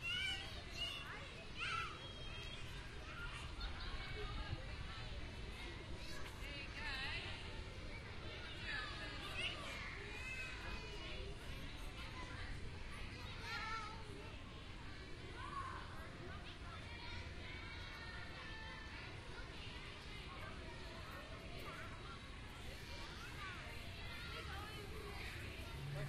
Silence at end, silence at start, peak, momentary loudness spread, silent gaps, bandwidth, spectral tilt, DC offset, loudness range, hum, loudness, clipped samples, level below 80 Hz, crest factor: 0 s; 0 s; -30 dBFS; 8 LU; none; 13.5 kHz; -4 dB/octave; under 0.1%; 5 LU; none; -49 LUFS; under 0.1%; -54 dBFS; 18 dB